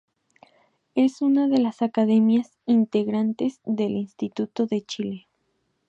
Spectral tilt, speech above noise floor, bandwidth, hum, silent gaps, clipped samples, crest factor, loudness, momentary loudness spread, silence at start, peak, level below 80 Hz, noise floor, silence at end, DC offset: -7 dB/octave; 50 dB; 8 kHz; none; none; under 0.1%; 14 dB; -23 LUFS; 11 LU; 0.95 s; -10 dBFS; -72 dBFS; -72 dBFS; 0.7 s; under 0.1%